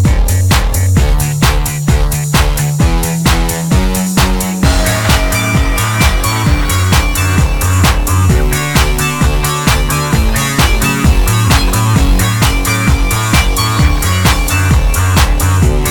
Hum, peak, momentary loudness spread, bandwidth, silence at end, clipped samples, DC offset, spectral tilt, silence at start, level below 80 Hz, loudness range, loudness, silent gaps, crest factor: none; 0 dBFS; 2 LU; 19.5 kHz; 0 s; under 0.1%; under 0.1%; -4.5 dB/octave; 0 s; -14 dBFS; 1 LU; -12 LUFS; none; 10 dB